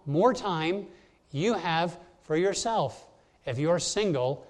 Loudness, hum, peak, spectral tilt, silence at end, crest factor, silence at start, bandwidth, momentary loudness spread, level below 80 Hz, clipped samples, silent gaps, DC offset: -28 LUFS; none; -10 dBFS; -4.5 dB/octave; 0.05 s; 20 dB; 0.05 s; 11.5 kHz; 11 LU; -60 dBFS; under 0.1%; none; under 0.1%